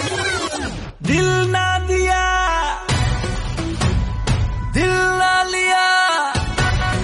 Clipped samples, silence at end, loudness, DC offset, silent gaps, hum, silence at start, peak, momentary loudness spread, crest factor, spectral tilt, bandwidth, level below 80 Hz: under 0.1%; 0 s; -18 LUFS; under 0.1%; none; none; 0 s; -6 dBFS; 8 LU; 12 dB; -4 dB/octave; 11.5 kHz; -26 dBFS